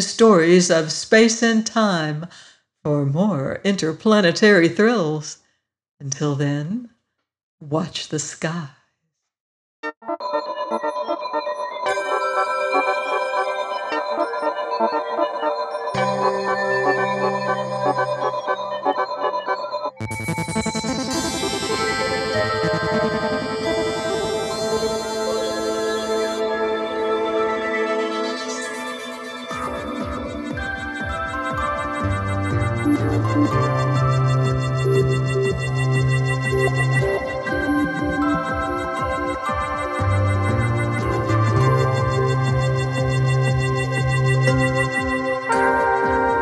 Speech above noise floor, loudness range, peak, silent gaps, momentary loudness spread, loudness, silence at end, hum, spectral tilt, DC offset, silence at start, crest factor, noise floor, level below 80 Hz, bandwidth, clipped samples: 58 dB; 7 LU; -2 dBFS; 5.91-5.97 s, 7.43-7.58 s, 9.40-9.83 s, 9.97-10.01 s; 9 LU; -21 LUFS; 0 s; none; -5.5 dB/octave; under 0.1%; 0 s; 18 dB; -76 dBFS; -42 dBFS; 12.5 kHz; under 0.1%